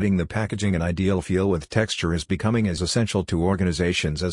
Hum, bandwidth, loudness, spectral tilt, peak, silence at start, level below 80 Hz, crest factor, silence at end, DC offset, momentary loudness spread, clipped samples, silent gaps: none; 11 kHz; -23 LUFS; -5.5 dB/octave; -6 dBFS; 0 s; -44 dBFS; 18 dB; 0 s; under 0.1%; 2 LU; under 0.1%; none